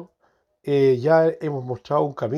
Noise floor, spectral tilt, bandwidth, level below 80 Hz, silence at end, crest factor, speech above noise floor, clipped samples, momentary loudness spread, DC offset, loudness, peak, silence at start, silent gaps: -66 dBFS; -8.5 dB/octave; 6.8 kHz; -66 dBFS; 0 s; 16 dB; 46 dB; under 0.1%; 12 LU; under 0.1%; -21 LUFS; -6 dBFS; 0 s; none